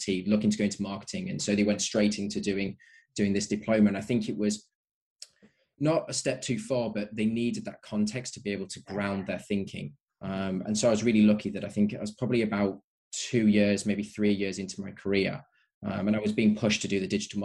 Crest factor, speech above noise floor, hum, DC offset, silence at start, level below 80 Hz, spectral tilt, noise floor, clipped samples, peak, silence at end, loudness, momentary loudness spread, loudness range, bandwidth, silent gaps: 16 dB; 36 dB; none; under 0.1%; 0 s; -62 dBFS; -5 dB/octave; -64 dBFS; under 0.1%; -12 dBFS; 0 s; -29 LUFS; 12 LU; 4 LU; 11 kHz; 4.75-4.84 s, 4.91-5.16 s, 12.84-13.11 s, 15.74-15.81 s